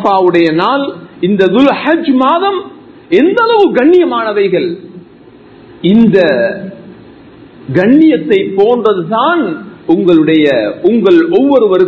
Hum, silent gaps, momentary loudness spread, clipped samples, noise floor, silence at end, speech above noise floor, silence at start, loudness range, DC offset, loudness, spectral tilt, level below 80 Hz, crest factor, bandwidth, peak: none; none; 9 LU; 0.6%; -37 dBFS; 0 s; 29 dB; 0 s; 3 LU; under 0.1%; -10 LUFS; -8 dB/octave; -52 dBFS; 10 dB; 6.4 kHz; 0 dBFS